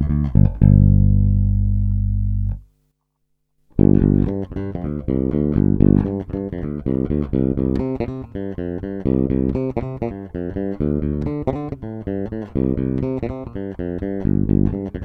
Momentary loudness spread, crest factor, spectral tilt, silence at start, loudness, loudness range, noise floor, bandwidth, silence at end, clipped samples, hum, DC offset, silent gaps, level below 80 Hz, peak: 13 LU; 18 dB; -12.5 dB/octave; 0 s; -20 LUFS; 5 LU; -70 dBFS; 3.5 kHz; 0 s; under 0.1%; 50 Hz at -35 dBFS; under 0.1%; none; -26 dBFS; 0 dBFS